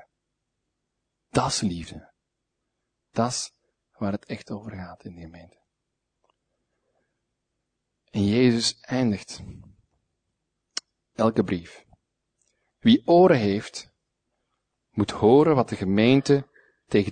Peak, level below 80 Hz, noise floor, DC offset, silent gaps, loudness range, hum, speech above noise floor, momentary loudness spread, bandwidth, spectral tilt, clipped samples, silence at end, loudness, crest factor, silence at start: -4 dBFS; -58 dBFS; -81 dBFS; under 0.1%; none; 14 LU; none; 59 dB; 21 LU; 9.6 kHz; -5.5 dB/octave; under 0.1%; 0 s; -23 LUFS; 22 dB; 1.35 s